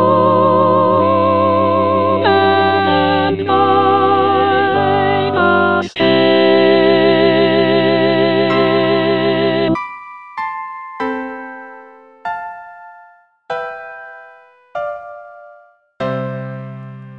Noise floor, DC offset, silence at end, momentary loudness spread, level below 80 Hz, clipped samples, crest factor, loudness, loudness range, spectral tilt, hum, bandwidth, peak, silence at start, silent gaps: -46 dBFS; under 0.1%; 0 s; 18 LU; -60 dBFS; under 0.1%; 14 dB; -13 LUFS; 16 LU; -7.5 dB/octave; none; 6.2 kHz; 0 dBFS; 0 s; none